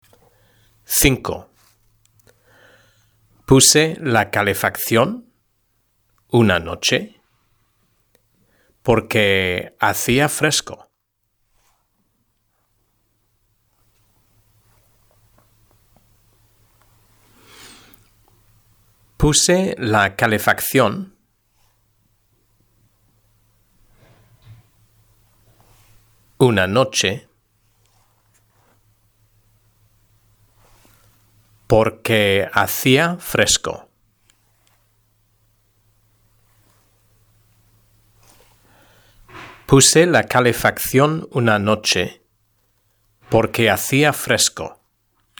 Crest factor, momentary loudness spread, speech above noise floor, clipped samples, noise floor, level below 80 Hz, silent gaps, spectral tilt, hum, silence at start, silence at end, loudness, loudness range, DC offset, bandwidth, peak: 22 dB; 14 LU; 55 dB; under 0.1%; -71 dBFS; -44 dBFS; none; -3.5 dB/octave; none; 0.9 s; 0.7 s; -16 LUFS; 7 LU; under 0.1%; over 20 kHz; 0 dBFS